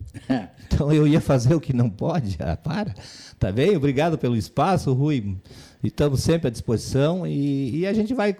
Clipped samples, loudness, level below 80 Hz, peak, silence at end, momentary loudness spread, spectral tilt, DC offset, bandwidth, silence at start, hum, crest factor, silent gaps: under 0.1%; -22 LUFS; -40 dBFS; -12 dBFS; 0.05 s; 9 LU; -7 dB/octave; under 0.1%; 14 kHz; 0 s; none; 10 dB; none